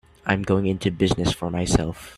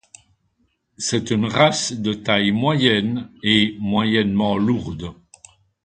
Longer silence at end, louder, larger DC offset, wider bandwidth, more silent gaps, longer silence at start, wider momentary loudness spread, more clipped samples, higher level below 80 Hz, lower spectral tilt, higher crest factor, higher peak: second, 0.05 s vs 0.7 s; second, -23 LUFS vs -19 LUFS; neither; first, 14 kHz vs 9.4 kHz; neither; second, 0.25 s vs 1 s; second, 3 LU vs 9 LU; neither; first, -38 dBFS vs -50 dBFS; about the same, -5.5 dB/octave vs -4.5 dB/octave; about the same, 20 dB vs 20 dB; about the same, -2 dBFS vs 0 dBFS